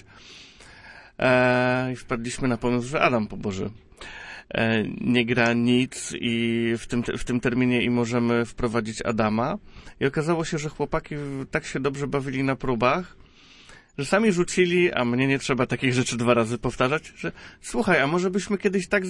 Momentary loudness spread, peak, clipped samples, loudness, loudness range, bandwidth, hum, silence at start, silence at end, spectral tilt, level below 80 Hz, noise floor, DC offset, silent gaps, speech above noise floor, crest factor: 12 LU; -6 dBFS; under 0.1%; -24 LUFS; 4 LU; 11.5 kHz; none; 0.25 s; 0 s; -5.5 dB/octave; -48 dBFS; -50 dBFS; under 0.1%; none; 26 dB; 20 dB